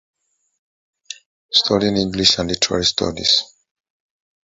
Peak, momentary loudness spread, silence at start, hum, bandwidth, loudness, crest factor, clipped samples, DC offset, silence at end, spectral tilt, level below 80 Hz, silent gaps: 0 dBFS; 21 LU; 1.1 s; none; 8 kHz; -16 LUFS; 22 dB; under 0.1%; under 0.1%; 1.05 s; -3 dB/octave; -46 dBFS; 1.26-1.49 s